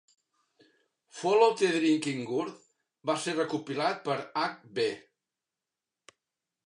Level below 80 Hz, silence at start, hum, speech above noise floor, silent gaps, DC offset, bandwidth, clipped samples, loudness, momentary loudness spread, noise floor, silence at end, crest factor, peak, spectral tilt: -84 dBFS; 1.15 s; none; 61 dB; none; under 0.1%; 11 kHz; under 0.1%; -29 LUFS; 11 LU; -90 dBFS; 1.65 s; 22 dB; -10 dBFS; -4.5 dB/octave